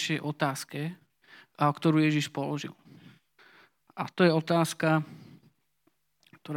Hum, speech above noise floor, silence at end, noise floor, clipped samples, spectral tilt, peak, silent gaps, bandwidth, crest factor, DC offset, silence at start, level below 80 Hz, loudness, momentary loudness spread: none; 46 dB; 0 s; -74 dBFS; under 0.1%; -6 dB/octave; -8 dBFS; none; 16.5 kHz; 22 dB; under 0.1%; 0 s; -84 dBFS; -28 LUFS; 14 LU